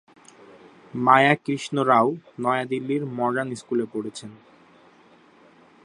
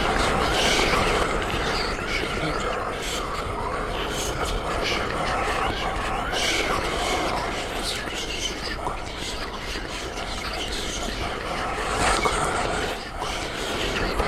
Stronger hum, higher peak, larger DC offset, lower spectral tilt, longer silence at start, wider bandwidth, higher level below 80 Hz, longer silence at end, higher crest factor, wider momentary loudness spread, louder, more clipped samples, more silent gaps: neither; first, -2 dBFS vs -6 dBFS; neither; first, -5.5 dB/octave vs -3 dB/octave; first, 0.95 s vs 0 s; second, 11 kHz vs 16.5 kHz; second, -74 dBFS vs -34 dBFS; first, 1.5 s vs 0 s; about the same, 22 dB vs 20 dB; first, 17 LU vs 9 LU; first, -22 LUFS vs -25 LUFS; neither; neither